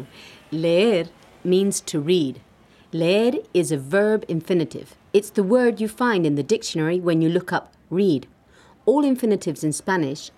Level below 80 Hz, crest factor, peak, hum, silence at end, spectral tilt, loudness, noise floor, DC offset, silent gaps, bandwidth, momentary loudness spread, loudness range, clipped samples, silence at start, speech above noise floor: -64 dBFS; 16 dB; -6 dBFS; none; 0.1 s; -5.5 dB/octave; -21 LUFS; -53 dBFS; under 0.1%; none; 15 kHz; 9 LU; 1 LU; under 0.1%; 0 s; 32 dB